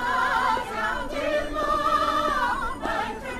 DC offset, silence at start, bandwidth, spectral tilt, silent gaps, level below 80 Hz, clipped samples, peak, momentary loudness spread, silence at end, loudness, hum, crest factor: under 0.1%; 0 s; 14 kHz; -3.5 dB/octave; none; -40 dBFS; under 0.1%; -10 dBFS; 6 LU; 0 s; -25 LUFS; none; 14 dB